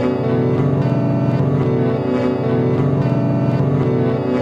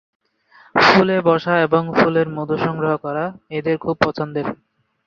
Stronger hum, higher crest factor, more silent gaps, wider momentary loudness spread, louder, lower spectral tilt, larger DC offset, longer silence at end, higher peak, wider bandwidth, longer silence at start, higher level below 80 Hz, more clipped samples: neither; second, 12 dB vs 18 dB; neither; second, 1 LU vs 12 LU; about the same, -17 LUFS vs -18 LUFS; first, -10 dB/octave vs -6.5 dB/octave; neither; second, 0 s vs 0.5 s; second, -4 dBFS vs 0 dBFS; second, 6.6 kHz vs 7.4 kHz; second, 0 s vs 0.75 s; first, -46 dBFS vs -54 dBFS; neither